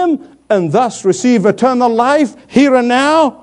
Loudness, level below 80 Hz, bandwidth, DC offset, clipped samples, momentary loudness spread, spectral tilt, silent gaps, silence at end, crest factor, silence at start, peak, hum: -12 LUFS; -58 dBFS; 10.5 kHz; under 0.1%; under 0.1%; 5 LU; -5 dB/octave; none; 0.1 s; 12 dB; 0 s; 0 dBFS; none